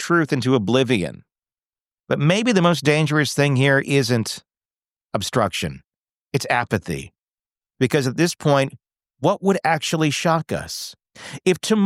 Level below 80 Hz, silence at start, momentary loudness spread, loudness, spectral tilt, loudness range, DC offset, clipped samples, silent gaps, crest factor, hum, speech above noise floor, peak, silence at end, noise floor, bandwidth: -54 dBFS; 0 s; 13 LU; -20 LUFS; -5 dB/octave; 5 LU; under 0.1%; under 0.1%; 1.66-1.70 s, 1.80-1.85 s, 5.98-6.05 s, 6.13-6.26 s; 16 dB; none; over 71 dB; -4 dBFS; 0 s; under -90 dBFS; 16 kHz